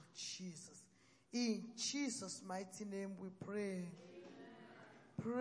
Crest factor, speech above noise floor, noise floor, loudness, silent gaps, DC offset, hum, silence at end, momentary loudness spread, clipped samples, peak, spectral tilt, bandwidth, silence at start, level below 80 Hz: 18 dB; 26 dB; -71 dBFS; -45 LUFS; none; under 0.1%; none; 0 s; 18 LU; under 0.1%; -28 dBFS; -4 dB/octave; 10.5 kHz; 0 s; -86 dBFS